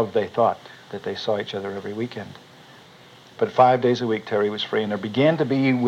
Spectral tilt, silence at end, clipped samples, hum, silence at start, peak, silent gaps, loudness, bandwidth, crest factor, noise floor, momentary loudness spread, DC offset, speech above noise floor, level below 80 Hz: -7 dB/octave; 0 s; under 0.1%; none; 0 s; -2 dBFS; none; -22 LUFS; 9.6 kHz; 20 dB; -48 dBFS; 15 LU; under 0.1%; 26 dB; -72 dBFS